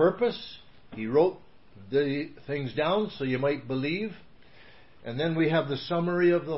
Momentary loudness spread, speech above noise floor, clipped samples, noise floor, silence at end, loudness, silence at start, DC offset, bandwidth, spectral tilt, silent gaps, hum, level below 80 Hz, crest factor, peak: 15 LU; 28 dB; under 0.1%; -55 dBFS; 0 s; -28 LUFS; 0 s; 0.3%; 5.8 kHz; -10.5 dB/octave; none; none; -62 dBFS; 18 dB; -10 dBFS